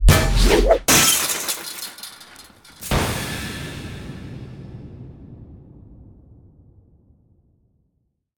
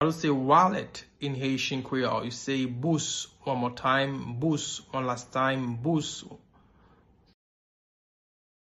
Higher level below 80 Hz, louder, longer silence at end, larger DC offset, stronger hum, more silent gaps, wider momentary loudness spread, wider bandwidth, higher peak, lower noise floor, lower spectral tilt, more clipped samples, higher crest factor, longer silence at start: first, -26 dBFS vs -64 dBFS; first, -18 LUFS vs -28 LUFS; first, 2.45 s vs 2.3 s; neither; neither; neither; first, 27 LU vs 12 LU; first, 19.5 kHz vs 12 kHz; first, -2 dBFS vs -8 dBFS; first, -71 dBFS vs -61 dBFS; second, -3 dB/octave vs -4.5 dB/octave; neither; about the same, 22 dB vs 22 dB; about the same, 0 s vs 0 s